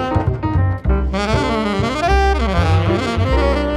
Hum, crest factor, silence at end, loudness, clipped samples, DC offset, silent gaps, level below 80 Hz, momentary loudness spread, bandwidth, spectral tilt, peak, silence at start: none; 14 dB; 0 s; -17 LUFS; under 0.1%; under 0.1%; none; -22 dBFS; 3 LU; 11 kHz; -6.5 dB/octave; -2 dBFS; 0 s